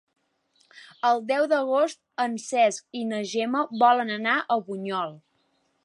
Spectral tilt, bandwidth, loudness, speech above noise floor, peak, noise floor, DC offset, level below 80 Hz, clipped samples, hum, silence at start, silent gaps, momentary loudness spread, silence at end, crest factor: -3.5 dB/octave; 11 kHz; -25 LUFS; 45 dB; -6 dBFS; -70 dBFS; under 0.1%; -84 dBFS; under 0.1%; none; 0.75 s; none; 10 LU; 0.65 s; 20 dB